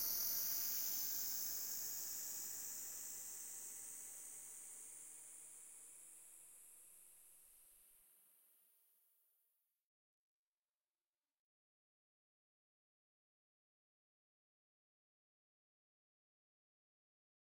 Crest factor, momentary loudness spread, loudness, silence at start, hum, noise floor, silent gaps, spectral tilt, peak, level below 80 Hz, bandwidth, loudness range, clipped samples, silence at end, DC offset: 22 dB; 22 LU; -43 LUFS; 0 s; none; under -90 dBFS; none; 1.5 dB/octave; -28 dBFS; -88 dBFS; 16.5 kHz; 22 LU; under 0.1%; 8.75 s; under 0.1%